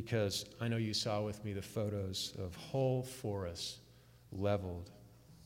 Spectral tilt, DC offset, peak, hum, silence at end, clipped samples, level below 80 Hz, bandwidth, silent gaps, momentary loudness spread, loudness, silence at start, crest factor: -5 dB/octave; under 0.1%; -22 dBFS; none; 0 s; under 0.1%; -64 dBFS; 16 kHz; none; 10 LU; -39 LUFS; 0 s; 16 dB